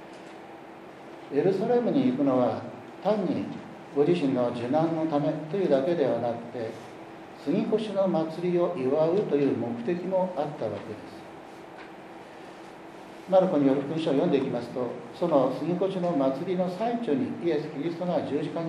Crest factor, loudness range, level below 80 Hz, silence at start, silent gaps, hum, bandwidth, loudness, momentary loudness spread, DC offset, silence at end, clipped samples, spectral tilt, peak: 18 dB; 4 LU; -74 dBFS; 0 s; none; none; 11 kHz; -27 LUFS; 20 LU; under 0.1%; 0 s; under 0.1%; -8 dB/octave; -8 dBFS